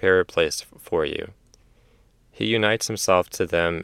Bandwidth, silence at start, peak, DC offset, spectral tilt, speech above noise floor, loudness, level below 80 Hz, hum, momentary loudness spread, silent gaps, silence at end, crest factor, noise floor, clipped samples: 16.5 kHz; 0 s; -4 dBFS; under 0.1%; -3.5 dB/octave; 36 dB; -23 LUFS; -52 dBFS; none; 10 LU; none; 0 s; 20 dB; -58 dBFS; under 0.1%